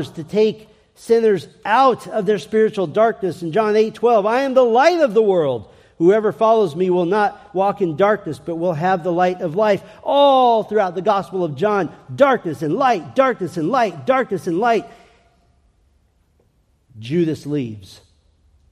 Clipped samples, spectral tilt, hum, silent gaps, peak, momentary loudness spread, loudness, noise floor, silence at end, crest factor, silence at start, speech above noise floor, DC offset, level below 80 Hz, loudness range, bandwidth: under 0.1%; -6.5 dB/octave; none; none; -2 dBFS; 8 LU; -18 LUFS; -60 dBFS; 0.85 s; 16 dB; 0 s; 43 dB; under 0.1%; -60 dBFS; 8 LU; 12.5 kHz